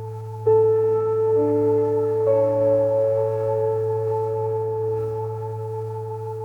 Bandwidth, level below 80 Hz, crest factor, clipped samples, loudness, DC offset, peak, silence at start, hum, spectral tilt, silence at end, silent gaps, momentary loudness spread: 2.9 kHz; -60 dBFS; 12 dB; under 0.1%; -22 LUFS; under 0.1%; -8 dBFS; 0 s; none; -10 dB/octave; 0 s; none; 11 LU